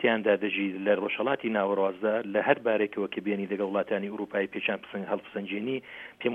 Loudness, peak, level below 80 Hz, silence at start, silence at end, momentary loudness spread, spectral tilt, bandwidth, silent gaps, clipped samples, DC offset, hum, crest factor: -29 LUFS; -6 dBFS; -76 dBFS; 0 s; 0 s; 8 LU; -7.5 dB/octave; 3.9 kHz; none; under 0.1%; under 0.1%; none; 22 dB